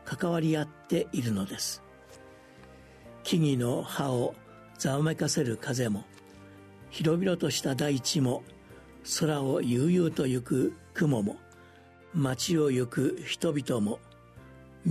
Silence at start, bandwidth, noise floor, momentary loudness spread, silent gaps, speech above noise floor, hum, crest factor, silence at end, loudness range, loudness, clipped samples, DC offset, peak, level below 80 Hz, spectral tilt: 0.05 s; 13.5 kHz; -54 dBFS; 8 LU; none; 26 dB; none; 16 dB; 0 s; 4 LU; -29 LUFS; under 0.1%; under 0.1%; -14 dBFS; -62 dBFS; -5.5 dB/octave